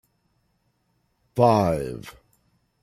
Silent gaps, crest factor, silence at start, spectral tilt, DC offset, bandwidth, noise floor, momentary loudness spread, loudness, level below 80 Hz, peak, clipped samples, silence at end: none; 22 dB; 1.35 s; -7.5 dB/octave; under 0.1%; 14.5 kHz; -70 dBFS; 16 LU; -22 LUFS; -54 dBFS; -4 dBFS; under 0.1%; 0.7 s